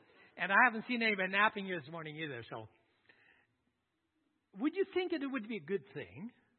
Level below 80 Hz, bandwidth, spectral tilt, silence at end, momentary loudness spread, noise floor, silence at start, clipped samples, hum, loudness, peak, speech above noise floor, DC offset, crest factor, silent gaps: -86 dBFS; 4.3 kHz; -2.5 dB/octave; 0.3 s; 19 LU; -83 dBFS; 0.35 s; under 0.1%; none; -34 LUFS; -14 dBFS; 47 dB; under 0.1%; 24 dB; none